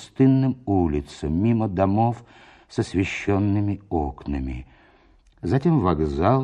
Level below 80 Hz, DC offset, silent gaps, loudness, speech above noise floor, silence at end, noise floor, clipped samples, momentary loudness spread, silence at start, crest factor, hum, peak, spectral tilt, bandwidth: -38 dBFS; under 0.1%; none; -23 LUFS; 34 dB; 0 s; -56 dBFS; under 0.1%; 10 LU; 0 s; 18 dB; none; -6 dBFS; -8.5 dB/octave; 10 kHz